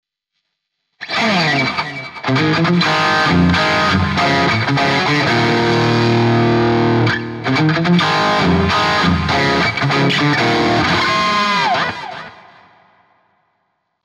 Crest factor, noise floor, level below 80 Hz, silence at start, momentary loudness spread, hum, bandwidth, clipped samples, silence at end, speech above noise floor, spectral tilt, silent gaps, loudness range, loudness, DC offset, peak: 14 dB; -74 dBFS; -40 dBFS; 1 s; 5 LU; none; 12 kHz; under 0.1%; 1.75 s; 60 dB; -5.5 dB/octave; none; 3 LU; -14 LUFS; under 0.1%; -2 dBFS